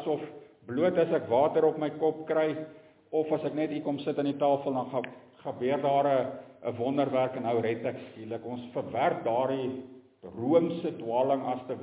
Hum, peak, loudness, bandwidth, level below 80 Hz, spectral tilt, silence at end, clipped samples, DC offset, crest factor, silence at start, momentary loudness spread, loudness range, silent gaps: none; -10 dBFS; -29 LUFS; 4 kHz; -72 dBFS; -10.5 dB/octave; 0 s; under 0.1%; under 0.1%; 18 dB; 0 s; 13 LU; 3 LU; none